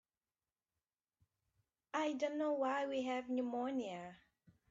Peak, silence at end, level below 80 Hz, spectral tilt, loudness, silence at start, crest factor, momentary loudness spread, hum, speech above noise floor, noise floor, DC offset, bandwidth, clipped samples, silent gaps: -26 dBFS; 0.55 s; -86 dBFS; -4.5 dB/octave; -40 LUFS; 1.95 s; 16 dB; 9 LU; none; over 51 dB; under -90 dBFS; under 0.1%; 7.8 kHz; under 0.1%; none